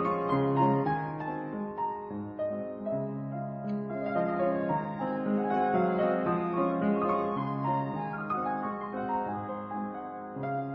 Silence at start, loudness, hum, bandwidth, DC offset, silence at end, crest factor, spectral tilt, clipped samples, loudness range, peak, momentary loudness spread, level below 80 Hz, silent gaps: 0 s; -31 LUFS; none; 5.4 kHz; under 0.1%; 0 s; 16 dB; -10.5 dB/octave; under 0.1%; 5 LU; -16 dBFS; 9 LU; -64 dBFS; none